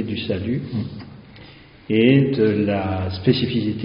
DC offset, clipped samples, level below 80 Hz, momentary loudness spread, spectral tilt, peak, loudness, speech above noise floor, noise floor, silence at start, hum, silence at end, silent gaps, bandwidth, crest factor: under 0.1%; under 0.1%; -52 dBFS; 13 LU; -6 dB/octave; -2 dBFS; -20 LUFS; 25 dB; -44 dBFS; 0 s; none; 0 s; none; 5.4 kHz; 18 dB